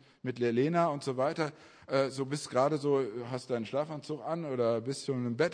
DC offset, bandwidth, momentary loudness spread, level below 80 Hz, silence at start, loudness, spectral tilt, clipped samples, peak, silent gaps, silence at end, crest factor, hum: under 0.1%; 10.5 kHz; 8 LU; -78 dBFS; 0.25 s; -32 LUFS; -6 dB/octave; under 0.1%; -14 dBFS; none; 0 s; 18 dB; none